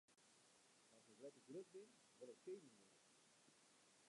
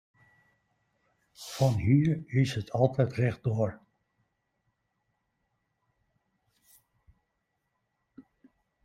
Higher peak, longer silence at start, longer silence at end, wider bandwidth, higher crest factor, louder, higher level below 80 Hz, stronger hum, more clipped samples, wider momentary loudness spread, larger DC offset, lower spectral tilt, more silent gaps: second, -46 dBFS vs -10 dBFS; second, 0.1 s vs 1.4 s; second, 0 s vs 0.65 s; second, 11 kHz vs 14.5 kHz; second, 18 dB vs 24 dB; second, -61 LUFS vs -28 LUFS; second, under -90 dBFS vs -62 dBFS; neither; neither; about the same, 6 LU vs 8 LU; neither; second, -4 dB/octave vs -7.5 dB/octave; neither